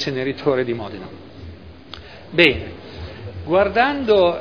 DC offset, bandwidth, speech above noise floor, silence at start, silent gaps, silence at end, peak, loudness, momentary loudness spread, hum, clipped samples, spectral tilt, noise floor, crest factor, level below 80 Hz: 0.4%; 5.4 kHz; 21 dB; 0 s; none; 0 s; 0 dBFS; -18 LUFS; 23 LU; none; under 0.1%; -6 dB/octave; -39 dBFS; 20 dB; -44 dBFS